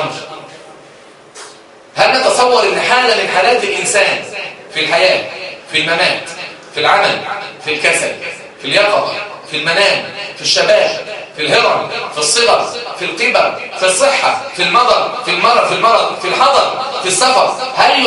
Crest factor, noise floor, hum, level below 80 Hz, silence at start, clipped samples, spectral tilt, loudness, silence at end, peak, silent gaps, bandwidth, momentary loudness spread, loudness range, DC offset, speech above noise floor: 14 dB; -39 dBFS; none; -56 dBFS; 0 s; under 0.1%; -1.5 dB/octave; -12 LUFS; 0 s; 0 dBFS; none; 11.5 kHz; 13 LU; 3 LU; under 0.1%; 27 dB